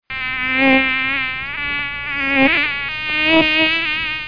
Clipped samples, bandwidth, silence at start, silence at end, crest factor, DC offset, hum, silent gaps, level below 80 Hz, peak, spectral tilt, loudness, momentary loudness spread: under 0.1%; 5.2 kHz; 0.1 s; 0 s; 16 dB; under 0.1%; none; none; -44 dBFS; -2 dBFS; -5.5 dB/octave; -16 LUFS; 8 LU